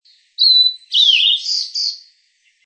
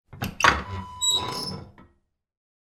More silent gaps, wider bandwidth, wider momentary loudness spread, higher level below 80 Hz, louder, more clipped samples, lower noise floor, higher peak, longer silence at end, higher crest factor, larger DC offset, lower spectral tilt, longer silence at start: neither; second, 8.8 kHz vs 19.5 kHz; second, 10 LU vs 15 LU; second, under -90 dBFS vs -46 dBFS; first, -12 LUFS vs -23 LUFS; neither; second, -59 dBFS vs -68 dBFS; about the same, -2 dBFS vs 0 dBFS; second, 0.65 s vs 0.95 s; second, 14 dB vs 28 dB; neither; second, 14.5 dB/octave vs -2 dB/octave; first, 0.4 s vs 0.1 s